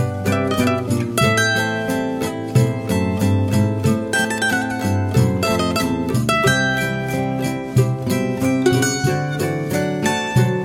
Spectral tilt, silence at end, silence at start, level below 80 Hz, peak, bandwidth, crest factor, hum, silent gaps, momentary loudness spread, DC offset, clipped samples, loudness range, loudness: -5.5 dB/octave; 0 s; 0 s; -46 dBFS; -4 dBFS; 17 kHz; 14 dB; none; none; 5 LU; under 0.1%; under 0.1%; 1 LU; -19 LUFS